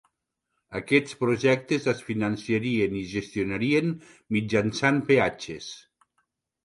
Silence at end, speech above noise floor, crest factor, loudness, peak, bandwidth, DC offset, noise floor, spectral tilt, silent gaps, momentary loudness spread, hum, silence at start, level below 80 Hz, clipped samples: 0.85 s; 55 dB; 20 dB; -25 LUFS; -6 dBFS; 11.5 kHz; under 0.1%; -81 dBFS; -6 dB/octave; none; 14 LU; none; 0.7 s; -58 dBFS; under 0.1%